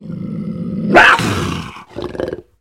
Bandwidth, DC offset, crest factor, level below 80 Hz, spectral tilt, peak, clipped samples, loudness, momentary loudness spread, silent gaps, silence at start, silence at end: 16.5 kHz; under 0.1%; 16 dB; -40 dBFS; -5 dB/octave; 0 dBFS; 0.2%; -14 LUFS; 19 LU; none; 0 s; 0.2 s